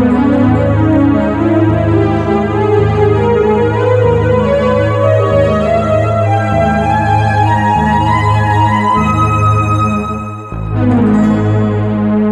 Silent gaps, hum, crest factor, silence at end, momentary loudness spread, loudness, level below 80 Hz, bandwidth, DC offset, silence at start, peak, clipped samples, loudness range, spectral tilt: none; none; 10 dB; 0 s; 3 LU; -11 LUFS; -28 dBFS; 9 kHz; under 0.1%; 0 s; 0 dBFS; under 0.1%; 1 LU; -8.5 dB/octave